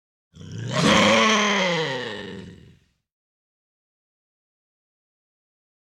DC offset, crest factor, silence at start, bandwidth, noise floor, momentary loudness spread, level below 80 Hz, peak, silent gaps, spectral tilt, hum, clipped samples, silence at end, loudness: under 0.1%; 20 dB; 0.35 s; 14 kHz; -55 dBFS; 21 LU; -56 dBFS; -6 dBFS; none; -3.5 dB/octave; none; under 0.1%; 3.3 s; -19 LUFS